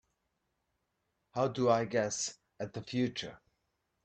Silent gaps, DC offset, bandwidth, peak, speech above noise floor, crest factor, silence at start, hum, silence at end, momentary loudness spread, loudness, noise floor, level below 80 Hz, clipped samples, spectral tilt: none; under 0.1%; 9 kHz; -16 dBFS; 49 dB; 20 dB; 1.35 s; none; 0.7 s; 14 LU; -34 LUFS; -82 dBFS; -72 dBFS; under 0.1%; -4.5 dB/octave